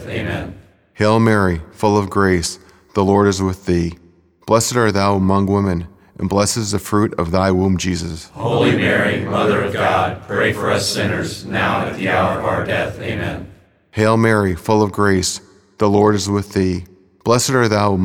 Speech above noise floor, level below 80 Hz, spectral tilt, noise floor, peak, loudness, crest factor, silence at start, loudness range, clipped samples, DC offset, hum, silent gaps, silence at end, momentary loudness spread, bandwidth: 24 dB; -42 dBFS; -5 dB/octave; -40 dBFS; 0 dBFS; -17 LUFS; 16 dB; 0 s; 2 LU; under 0.1%; under 0.1%; none; none; 0 s; 11 LU; 17.5 kHz